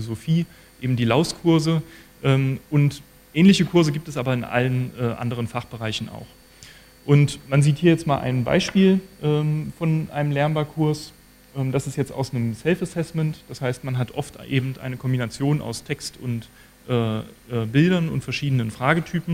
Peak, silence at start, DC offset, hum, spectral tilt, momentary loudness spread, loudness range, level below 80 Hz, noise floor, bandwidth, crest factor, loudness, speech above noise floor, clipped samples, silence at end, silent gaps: -2 dBFS; 0 s; under 0.1%; none; -6.5 dB/octave; 11 LU; 6 LU; -52 dBFS; -47 dBFS; 15 kHz; 20 dB; -22 LUFS; 25 dB; under 0.1%; 0 s; none